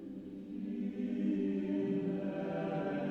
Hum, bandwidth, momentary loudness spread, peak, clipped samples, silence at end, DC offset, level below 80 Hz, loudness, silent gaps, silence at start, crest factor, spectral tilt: none; 6.6 kHz; 9 LU; -24 dBFS; under 0.1%; 0 s; under 0.1%; -70 dBFS; -37 LUFS; none; 0 s; 12 dB; -9.5 dB/octave